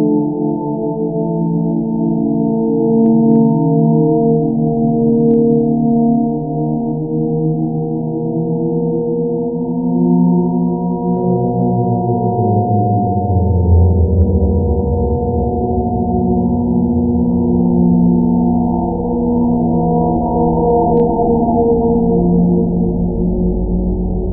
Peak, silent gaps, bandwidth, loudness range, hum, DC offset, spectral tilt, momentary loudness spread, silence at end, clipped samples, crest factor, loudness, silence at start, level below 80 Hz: -2 dBFS; none; 1.1 kHz; 3 LU; none; 0.2%; -17 dB/octave; 6 LU; 0 s; under 0.1%; 12 dB; -14 LUFS; 0 s; -26 dBFS